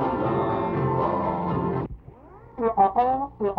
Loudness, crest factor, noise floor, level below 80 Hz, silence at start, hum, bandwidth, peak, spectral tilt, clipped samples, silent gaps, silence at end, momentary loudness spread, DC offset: -24 LUFS; 16 dB; -46 dBFS; -48 dBFS; 0 s; none; 5.4 kHz; -8 dBFS; -10.5 dB/octave; under 0.1%; none; 0 s; 11 LU; under 0.1%